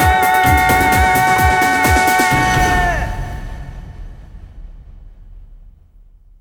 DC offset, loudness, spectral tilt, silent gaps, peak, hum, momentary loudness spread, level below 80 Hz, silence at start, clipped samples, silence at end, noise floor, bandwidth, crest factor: under 0.1%; -13 LUFS; -4 dB/octave; none; 0 dBFS; none; 20 LU; -26 dBFS; 0 s; under 0.1%; 0.85 s; -44 dBFS; 19 kHz; 14 dB